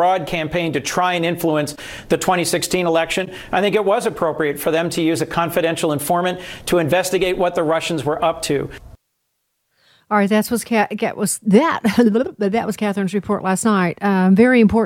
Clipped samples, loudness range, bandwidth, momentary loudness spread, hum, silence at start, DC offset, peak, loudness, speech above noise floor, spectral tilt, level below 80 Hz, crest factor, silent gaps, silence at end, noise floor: under 0.1%; 4 LU; 17 kHz; 7 LU; none; 0 s; under 0.1%; -2 dBFS; -18 LUFS; 54 dB; -5 dB/octave; -48 dBFS; 16 dB; none; 0 s; -72 dBFS